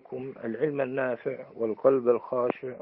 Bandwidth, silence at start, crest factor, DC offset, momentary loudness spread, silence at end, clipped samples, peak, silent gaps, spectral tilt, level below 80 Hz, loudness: 3.9 kHz; 0.1 s; 18 dB; under 0.1%; 12 LU; 0.05 s; under 0.1%; -10 dBFS; none; -11 dB/octave; -76 dBFS; -28 LUFS